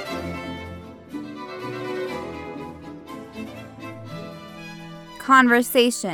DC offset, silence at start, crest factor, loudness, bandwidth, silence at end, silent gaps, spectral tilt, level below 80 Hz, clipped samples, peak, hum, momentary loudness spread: under 0.1%; 0 s; 22 dB; -21 LUFS; over 20 kHz; 0 s; none; -4 dB/octave; -54 dBFS; under 0.1%; -2 dBFS; none; 21 LU